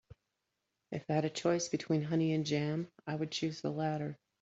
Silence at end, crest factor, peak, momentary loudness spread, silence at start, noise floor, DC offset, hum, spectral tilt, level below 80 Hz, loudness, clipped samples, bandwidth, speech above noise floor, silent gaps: 0.25 s; 18 dB; -18 dBFS; 8 LU; 0.1 s; -86 dBFS; under 0.1%; none; -5.5 dB/octave; -74 dBFS; -35 LUFS; under 0.1%; 8 kHz; 51 dB; none